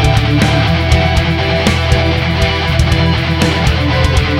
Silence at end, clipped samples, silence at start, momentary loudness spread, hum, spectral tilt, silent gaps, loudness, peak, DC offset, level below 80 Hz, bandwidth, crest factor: 0 s; 0.2%; 0 s; 2 LU; none; -5.5 dB/octave; none; -12 LUFS; 0 dBFS; under 0.1%; -18 dBFS; 15.5 kHz; 12 dB